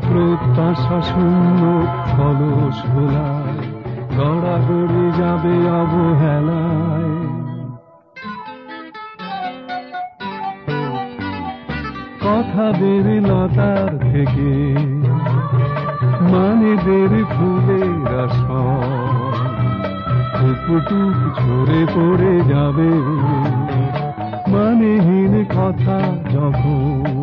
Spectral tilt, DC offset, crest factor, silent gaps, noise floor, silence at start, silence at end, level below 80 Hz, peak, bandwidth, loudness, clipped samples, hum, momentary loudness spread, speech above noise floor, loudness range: -11 dB/octave; under 0.1%; 12 dB; none; -39 dBFS; 0 s; 0 s; -38 dBFS; -4 dBFS; 5.4 kHz; -17 LUFS; under 0.1%; none; 12 LU; 24 dB; 9 LU